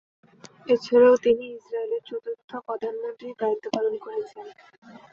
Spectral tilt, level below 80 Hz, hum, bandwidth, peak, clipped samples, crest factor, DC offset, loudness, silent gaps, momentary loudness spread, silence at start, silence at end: -5 dB/octave; -68 dBFS; none; 7 kHz; -6 dBFS; under 0.1%; 20 dB; under 0.1%; -25 LUFS; 2.44-2.48 s, 4.78-4.82 s; 18 LU; 0.65 s; 0.15 s